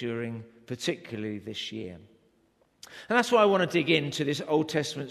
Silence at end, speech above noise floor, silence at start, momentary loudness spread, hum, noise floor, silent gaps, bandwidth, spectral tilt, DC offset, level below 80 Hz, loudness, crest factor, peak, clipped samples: 0 s; 39 dB; 0 s; 19 LU; none; -67 dBFS; none; 13.5 kHz; -5 dB/octave; under 0.1%; -70 dBFS; -27 LUFS; 20 dB; -8 dBFS; under 0.1%